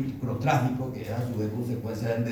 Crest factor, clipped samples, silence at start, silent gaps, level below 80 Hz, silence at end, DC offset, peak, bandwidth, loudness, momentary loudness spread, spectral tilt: 18 dB; under 0.1%; 0 s; none; -56 dBFS; 0 s; under 0.1%; -10 dBFS; over 20 kHz; -29 LUFS; 7 LU; -7.5 dB/octave